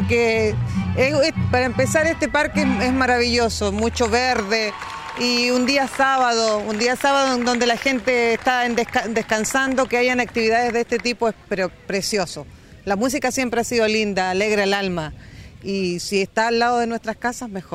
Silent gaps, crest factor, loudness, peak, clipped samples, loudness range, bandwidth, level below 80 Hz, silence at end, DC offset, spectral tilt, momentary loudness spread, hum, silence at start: none; 14 dB; -20 LUFS; -6 dBFS; under 0.1%; 3 LU; 16 kHz; -44 dBFS; 0 s; under 0.1%; -4 dB/octave; 7 LU; none; 0 s